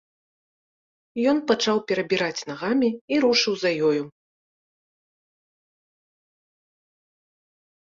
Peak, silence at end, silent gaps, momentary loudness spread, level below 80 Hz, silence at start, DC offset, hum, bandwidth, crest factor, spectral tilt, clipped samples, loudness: -6 dBFS; 3.75 s; 3.01-3.08 s; 8 LU; -68 dBFS; 1.15 s; under 0.1%; none; 7.6 kHz; 20 dB; -4 dB/octave; under 0.1%; -23 LUFS